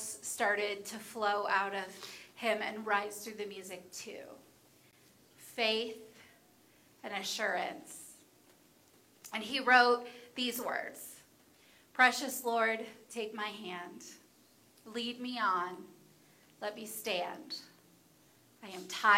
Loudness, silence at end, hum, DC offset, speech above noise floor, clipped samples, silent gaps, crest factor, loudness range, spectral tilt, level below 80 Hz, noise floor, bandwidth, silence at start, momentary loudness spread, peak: -34 LUFS; 0 s; none; under 0.1%; 31 dB; under 0.1%; none; 24 dB; 8 LU; -1.5 dB/octave; -86 dBFS; -65 dBFS; 16.5 kHz; 0 s; 21 LU; -12 dBFS